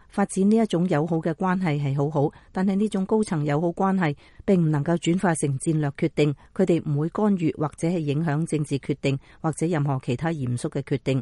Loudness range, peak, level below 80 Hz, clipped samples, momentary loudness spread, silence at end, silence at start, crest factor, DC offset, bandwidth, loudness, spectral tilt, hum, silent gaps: 2 LU; -8 dBFS; -54 dBFS; under 0.1%; 6 LU; 0 s; 0.15 s; 14 dB; under 0.1%; 11.5 kHz; -24 LUFS; -7 dB/octave; none; none